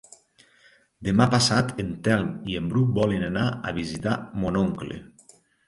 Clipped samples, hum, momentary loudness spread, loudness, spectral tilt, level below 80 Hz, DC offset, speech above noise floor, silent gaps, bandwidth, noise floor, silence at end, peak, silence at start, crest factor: under 0.1%; none; 10 LU; -25 LUFS; -5.5 dB/octave; -48 dBFS; under 0.1%; 35 dB; none; 11.5 kHz; -59 dBFS; 0.6 s; -6 dBFS; 1 s; 18 dB